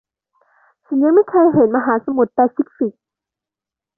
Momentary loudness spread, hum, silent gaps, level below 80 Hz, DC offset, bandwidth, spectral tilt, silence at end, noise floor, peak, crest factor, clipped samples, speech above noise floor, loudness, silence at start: 10 LU; none; none; -62 dBFS; under 0.1%; 2.2 kHz; -13 dB/octave; 1.1 s; -88 dBFS; -2 dBFS; 14 dB; under 0.1%; 73 dB; -16 LUFS; 0.9 s